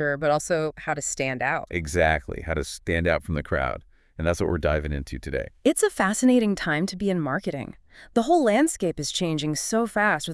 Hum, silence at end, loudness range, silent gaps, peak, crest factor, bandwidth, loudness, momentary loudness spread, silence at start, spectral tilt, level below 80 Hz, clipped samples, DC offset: none; 0 s; 3 LU; none; -6 dBFS; 18 dB; 12 kHz; -24 LUFS; 10 LU; 0 s; -4.5 dB/octave; -42 dBFS; under 0.1%; under 0.1%